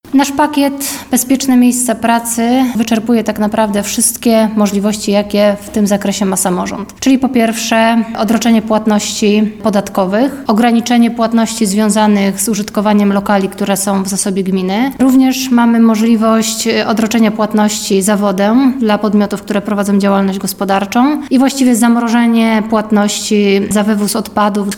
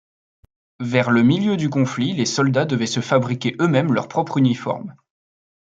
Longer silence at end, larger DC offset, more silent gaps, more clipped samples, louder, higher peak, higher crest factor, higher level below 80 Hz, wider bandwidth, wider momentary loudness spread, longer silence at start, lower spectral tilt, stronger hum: second, 0 s vs 0.75 s; first, 0.2% vs under 0.1%; neither; neither; first, -12 LUFS vs -19 LUFS; about the same, -2 dBFS vs -2 dBFS; second, 10 dB vs 18 dB; first, -46 dBFS vs -62 dBFS; first, 17.5 kHz vs 9 kHz; second, 4 LU vs 8 LU; second, 0.05 s vs 0.8 s; second, -4.5 dB/octave vs -6 dB/octave; neither